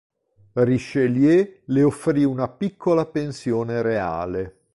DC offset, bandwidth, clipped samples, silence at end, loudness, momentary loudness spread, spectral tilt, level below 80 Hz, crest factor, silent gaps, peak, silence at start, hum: under 0.1%; 11.5 kHz; under 0.1%; 0.25 s; -22 LUFS; 9 LU; -8 dB/octave; -52 dBFS; 14 dB; none; -8 dBFS; 0.55 s; none